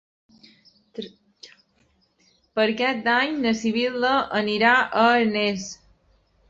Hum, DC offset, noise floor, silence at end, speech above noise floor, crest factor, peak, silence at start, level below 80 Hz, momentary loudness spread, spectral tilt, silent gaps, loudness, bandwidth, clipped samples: none; under 0.1%; -65 dBFS; 0.75 s; 43 dB; 20 dB; -4 dBFS; 0.95 s; -62 dBFS; 20 LU; -4 dB/octave; none; -21 LUFS; 7.8 kHz; under 0.1%